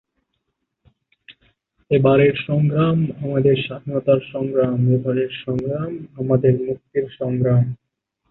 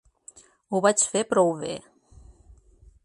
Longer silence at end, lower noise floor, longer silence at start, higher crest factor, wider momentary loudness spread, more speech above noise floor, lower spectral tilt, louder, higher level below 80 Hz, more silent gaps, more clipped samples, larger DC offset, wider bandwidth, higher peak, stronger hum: second, 0.55 s vs 1.25 s; first, -75 dBFS vs -55 dBFS; first, 1.3 s vs 0.7 s; second, 16 dB vs 22 dB; second, 9 LU vs 13 LU; first, 57 dB vs 32 dB; first, -11 dB/octave vs -3.5 dB/octave; first, -19 LUFS vs -23 LUFS; first, -52 dBFS vs -58 dBFS; neither; neither; neither; second, 4.1 kHz vs 11.5 kHz; about the same, -4 dBFS vs -6 dBFS; neither